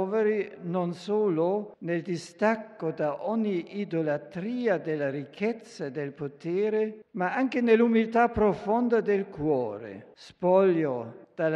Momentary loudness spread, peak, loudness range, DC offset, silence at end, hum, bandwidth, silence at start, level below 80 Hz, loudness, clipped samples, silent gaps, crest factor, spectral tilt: 12 LU; -8 dBFS; 5 LU; under 0.1%; 0 s; none; 10 kHz; 0 s; -60 dBFS; -28 LUFS; under 0.1%; none; 18 dB; -7.5 dB/octave